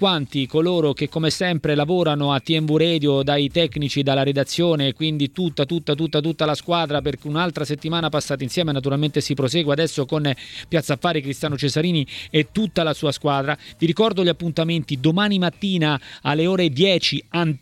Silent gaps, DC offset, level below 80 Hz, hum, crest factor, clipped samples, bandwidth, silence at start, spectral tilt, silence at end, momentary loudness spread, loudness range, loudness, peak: none; under 0.1%; -52 dBFS; none; 16 dB; under 0.1%; 14.5 kHz; 0 s; -5.5 dB/octave; 0 s; 5 LU; 3 LU; -21 LUFS; -4 dBFS